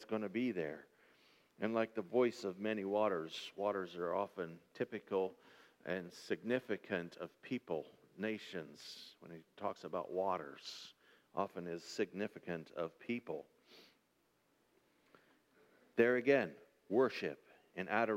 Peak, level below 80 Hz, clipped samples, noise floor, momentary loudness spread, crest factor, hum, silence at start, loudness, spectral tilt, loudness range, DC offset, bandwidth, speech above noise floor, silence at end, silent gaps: -18 dBFS; -86 dBFS; under 0.1%; -78 dBFS; 15 LU; 24 dB; none; 0 s; -40 LUFS; -5.5 dB/octave; 8 LU; under 0.1%; 16 kHz; 38 dB; 0 s; none